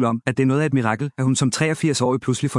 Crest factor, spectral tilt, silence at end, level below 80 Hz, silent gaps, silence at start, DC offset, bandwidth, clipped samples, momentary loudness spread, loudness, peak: 18 dB; -5.5 dB/octave; 0 s; -60 dBFS; none; 0 s; under 0.1%; 12 kHz; under 0.1%; 3 LU; -20 LUFS; -2 dBFS